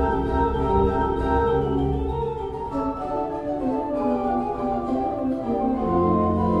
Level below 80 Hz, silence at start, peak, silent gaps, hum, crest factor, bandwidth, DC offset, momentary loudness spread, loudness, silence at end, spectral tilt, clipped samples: -34 dBFS; 0 s; -8 dBFS; none; none; 14 dB; 8.8 kHz; under 0.1%; 6 LU; -24 LUFS; 0 s; -9.5 dB/octave; under 0.1%